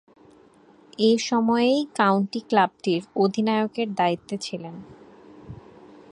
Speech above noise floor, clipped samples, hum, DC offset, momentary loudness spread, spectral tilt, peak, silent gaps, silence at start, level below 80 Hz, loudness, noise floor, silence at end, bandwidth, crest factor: 31 dB; under 0.1%; none; under 0.1%; 23 LU; -5.5 dB/octave; -6 dBFS; none; 1 s; -64 dBFS; -23 LUFS; -54 dBFS; 0.55 s; 11 kHz; 18 dB